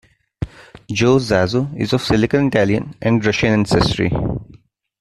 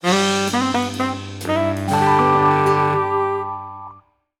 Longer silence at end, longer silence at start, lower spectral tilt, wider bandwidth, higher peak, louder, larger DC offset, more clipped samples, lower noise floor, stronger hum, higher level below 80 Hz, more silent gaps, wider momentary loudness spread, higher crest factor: about the same, 0.55 s vs 0.45 s; first, 0.4 s vs 0.05 s; about the same, -6 dB/octave vs -5 dB/octave; second, 13 kHz vs 17 kHz; first, 0 dBFS vs -4 dBFS; about the same, -17 LUFS vs -18 LUFS; neither; neither; about the same, -48 dBFS vs -48 dBFS; neither; first, -38 dBFS vs -56 dBFS; neither; about the same, 14 LU vs 13 LU; about the same, 18 dB vs 16 dB